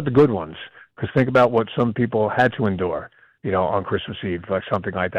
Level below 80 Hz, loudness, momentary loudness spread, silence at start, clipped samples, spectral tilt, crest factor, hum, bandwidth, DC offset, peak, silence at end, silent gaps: -52 dBFS; -21 LUFS; 14 LU; 0 s; under 0.1%; -8.5 dB/octave; 14 dB; none; 7.8 kHz; under 0.1%; -6 dBFS; 0 s; none